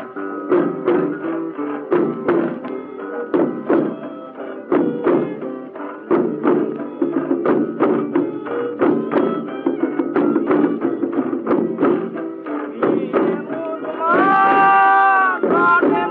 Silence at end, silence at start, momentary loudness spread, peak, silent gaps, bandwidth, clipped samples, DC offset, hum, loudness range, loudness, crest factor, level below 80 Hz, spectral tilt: 0 s; 0 s; 14 LU; -4 dBFS; none; 4.5 kHz; under 0.1%; under 0.1%; none; 6 LU; -18 LUFS; 14 dB; -70 dBFS; -10 dB/octave